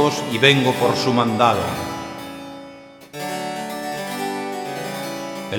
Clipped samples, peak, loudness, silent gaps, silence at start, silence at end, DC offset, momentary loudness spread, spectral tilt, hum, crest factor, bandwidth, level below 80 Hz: under 0.1%; 0 dBFS; -21 LUFS; none; 0 s; 0 s; under 0.1%; 18 LU; -4.5 dB/octave; none; 22 dB; 19 kHz; -58 dBFS